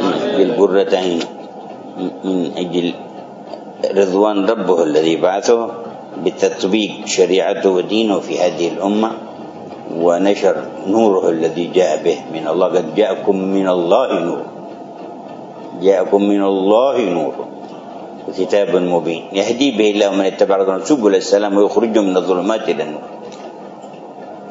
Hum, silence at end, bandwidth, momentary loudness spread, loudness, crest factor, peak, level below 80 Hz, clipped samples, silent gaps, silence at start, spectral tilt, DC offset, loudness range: none; 0 s; 7.8 kHz; 18 LU; -16 LUFS; 16 dB; 0 dBFS; -68 dBFS; under 0.1%; none; 0 s; -5 dB/octave; under 0.1%; 3 LU